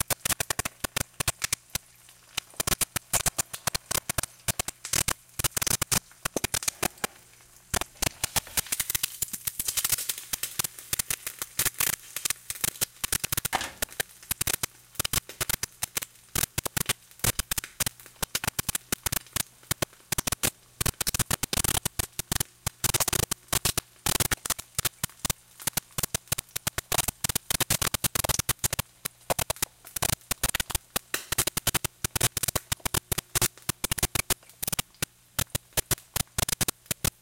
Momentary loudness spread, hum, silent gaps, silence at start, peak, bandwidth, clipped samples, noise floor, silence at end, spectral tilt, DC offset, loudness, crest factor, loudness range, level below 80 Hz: 6 LU; none; none; 0.1 s; -8 dBFS; 17 kHz; under 0.1%; -55 dBFS; 0.1 s; -1.5 dB/octave; under 0.1%; -28 LUFS; 22 dB; 2 LU; -46 dBFS